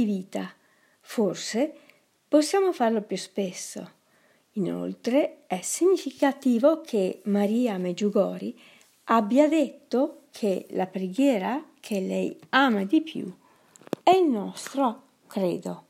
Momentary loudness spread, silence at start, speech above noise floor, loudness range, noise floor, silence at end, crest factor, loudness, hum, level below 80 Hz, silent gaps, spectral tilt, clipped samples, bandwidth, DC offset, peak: 14 LU; 0 s; 38 dB; 3 LU; -63 dBFS; 0.1 s; 22 dB; -26 LUFS; none; -82 dBFS; none; -5 dB/octave; under 0.1%; 16 kHz; under 0.1%; -4 dBFS